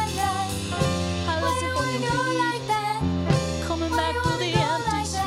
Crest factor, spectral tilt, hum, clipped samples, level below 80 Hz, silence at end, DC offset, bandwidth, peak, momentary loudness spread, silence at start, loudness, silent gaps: 16 dB; -4.5 dB/octave; none; under 0.1%; -40 dBFS; 0 s; under 0.1%; 16 kHz; -8 dBFS; 3 LU; 0 s; -25 LUFS; none